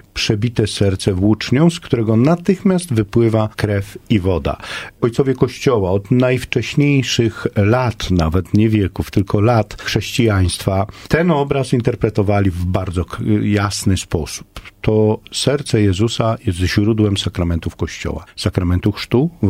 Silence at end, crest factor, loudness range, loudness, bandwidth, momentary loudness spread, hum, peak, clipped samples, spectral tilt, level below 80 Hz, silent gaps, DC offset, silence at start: 0 s; 16 dB; 2 LU; -17 LUFS; 15.5 kHz; 6 LU; none; 0 dBFS; under 0.1%; -6 dB/octave; -36 dBFS; none; under 0.1%; 0.15 s